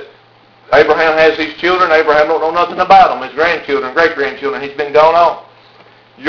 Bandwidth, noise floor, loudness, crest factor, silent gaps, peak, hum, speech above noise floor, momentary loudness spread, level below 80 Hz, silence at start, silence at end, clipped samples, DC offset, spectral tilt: 5.4 kHz; -46 dBFS; -11 LUFS; 12 dB; none; 0 dBFS; none; 35 dB; 9 LU; -46 dBFS; 0 s; 0 s; 0.5%; under 0.1%; -4.5 dB/octave